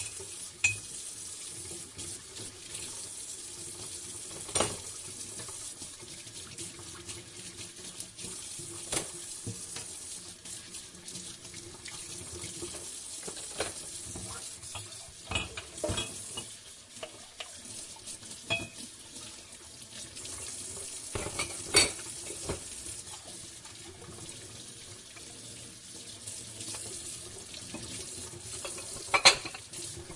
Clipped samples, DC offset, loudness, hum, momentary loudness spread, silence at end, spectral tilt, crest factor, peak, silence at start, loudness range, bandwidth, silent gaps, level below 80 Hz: under 0.1%; under 0.1%; -35 LUFS; none; 13 LU; 0 s; -1 dB/octave; 34 dB; -4 dBFS; 0 s; 9 LU; 11.5 kHz; none; -60 dBFS